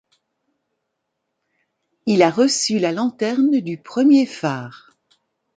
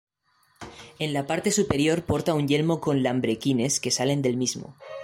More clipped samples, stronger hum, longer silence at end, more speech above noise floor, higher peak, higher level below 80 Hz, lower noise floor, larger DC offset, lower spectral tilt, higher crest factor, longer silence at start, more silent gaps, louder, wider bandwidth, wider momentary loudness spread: neither; neither; first, 0.8 s vs 0 s; first, 59 dB vs 41 dB; first, -2 dBFS vs -8 dBFS; second, -68 dBFS vs -54 dBFS; first, -77 dBFS vs -66 dBFS; neither; about the same, -4.5 dB/octave vs -4.5 dB/octave; about the same, 18 dB vs 16 dB; first, 2.05 s vs 0.6 s; neither; first, -18 LUFS vs -24 LUFS; second, 9.4 kHz vs 16 kHz; second, 12 LU vs 16 LU